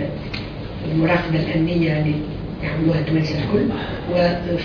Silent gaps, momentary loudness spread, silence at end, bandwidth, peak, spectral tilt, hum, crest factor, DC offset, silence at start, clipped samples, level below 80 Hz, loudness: none; 10 LU; 0 s; 5.4 kHz; -6 dBFS; -8.5 dB/octave; none; 14 dB; under 0.1%; 0 s; under 0.1%; -38 dBFS; -21 LUFS